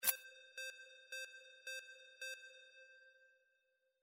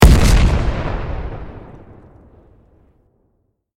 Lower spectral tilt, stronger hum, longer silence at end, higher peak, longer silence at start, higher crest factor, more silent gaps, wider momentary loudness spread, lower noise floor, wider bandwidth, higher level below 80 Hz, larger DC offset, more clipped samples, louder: second, 2.5 dB/octave vs -6 dB/octave; neither; second, 0.7 s vs 2 s; second, -18 dBFS vs 0 dBFS; about the same, 0 s vs 0 s; first, 32 dB vs 16 dB; neither; second, 13 LU vs 24 LU; first, -83 dBFS vs -65 dBFS; about the same, 16 kHz vs 16.5 kHz; second, under -90 dBFS vs -18 dBFS; neither; second, under 0.1% vs 0.1%; second, -48 LUFS vs -17 LUFS